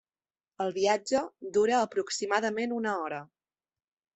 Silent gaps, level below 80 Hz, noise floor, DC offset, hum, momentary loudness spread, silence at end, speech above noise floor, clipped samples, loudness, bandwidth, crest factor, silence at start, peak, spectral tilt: none; -72 dBFS; under -90 dBFS; under 0.1%; none; 8 LU; 0.9 s; over 61 dB; under 0.1%; -29 LUFS; 8.4 kHz; 20 dB; 0.6 s; -12 dBFS; -3.5 dB/octave